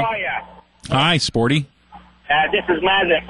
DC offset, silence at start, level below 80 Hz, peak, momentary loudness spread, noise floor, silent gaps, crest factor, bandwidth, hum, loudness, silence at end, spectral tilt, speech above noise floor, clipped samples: under 0.1%; 0 s; -46 dBFS; -4 dBFS; 11 LU; -45 dBFS; none; 16 dB; 11.5 kHz; none; -18 LUFS; 0 s; -4.5 dB/octave; 28 dB; under 0.1%